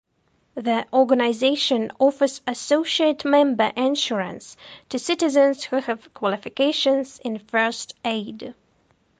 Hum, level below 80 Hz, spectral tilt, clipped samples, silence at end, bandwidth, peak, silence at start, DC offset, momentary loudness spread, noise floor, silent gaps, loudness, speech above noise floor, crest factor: none; -68 dBFS; -3.5 dB/octave; under 0.1%; 0.65 s; 9.6 kHz; -6 dBFS; 0.55 s; under 0.1%; 13 LU; -66 dBFS; none; -22 LUFS; 45 dB; 16 dB